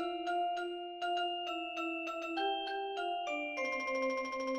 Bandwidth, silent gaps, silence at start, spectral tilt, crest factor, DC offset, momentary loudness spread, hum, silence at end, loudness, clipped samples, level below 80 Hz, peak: 15 kHz; none; 0 s; -2 dB/octave; 12 dB; under 0.1%; 3 LU; none; 0 s; -37 LUFS; under 0.1%; -76 dBFS; -24 dBFS